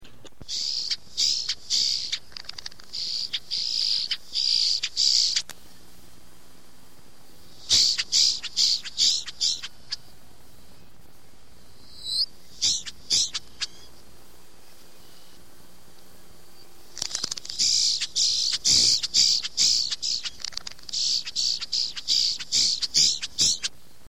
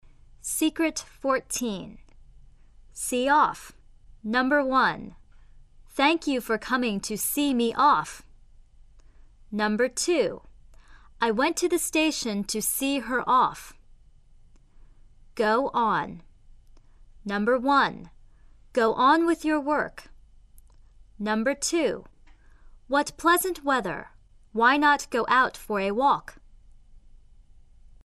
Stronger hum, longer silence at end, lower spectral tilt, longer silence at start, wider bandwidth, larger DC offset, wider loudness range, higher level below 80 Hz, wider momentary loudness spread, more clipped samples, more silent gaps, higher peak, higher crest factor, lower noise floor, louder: neither; second, 0.4 s vs 1.05 s; second, 2 dB/octave vs -3 dB/octave; second, 0 s vs 0.45 s; first, 16.5 kHz vs 14 kHz; first, 1% vs under 0.1%; first, 10 LU vs 5 LU; second, -58 dBFS vs -52 dBFS; about the same, 15 LU vs 15 LU; neither; neither; about the same, -8 dBFS vs -8 dBFS; about the same, 20 dB vs 20 dB; about the same, -54 dBFS vs -53 dBFS; first, -22 LUFS vs -25 LUFS